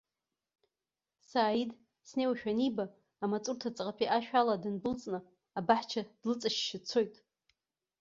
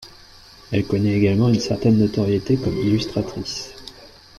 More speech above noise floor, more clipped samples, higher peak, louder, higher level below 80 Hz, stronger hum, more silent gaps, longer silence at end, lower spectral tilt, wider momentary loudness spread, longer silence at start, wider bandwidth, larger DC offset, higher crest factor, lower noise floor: first, over 57 dB vs 27 dB; neither; second, -12 dBFS vs -6 dBFS; second, -34 LUFS vs -20 LUFS; second, -74 dBFS vs -46 dBFS; neither; neither; first, 0.85 s vs 0.3 s; second, -3 dB/octave vs -7 dB/octave; about the same, 10 LU vs 12 LU; first, 1.35 s vs 0 s; second, 7.6 kHz vs 12.5 kHz; neither; first, 22 dB vs 14 dB; first, under -90 dBFS vs -46 dBFS